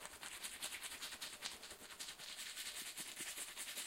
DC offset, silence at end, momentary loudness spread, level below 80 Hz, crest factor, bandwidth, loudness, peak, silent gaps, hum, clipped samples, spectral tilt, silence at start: under 0.1%; 0 s; 4 LU; -76 dBFS; 28 dB; 16.5 kHz; -47 LUFS; -22 dBFS; none; none; under 0.1%; 1 dB/octave; 0 s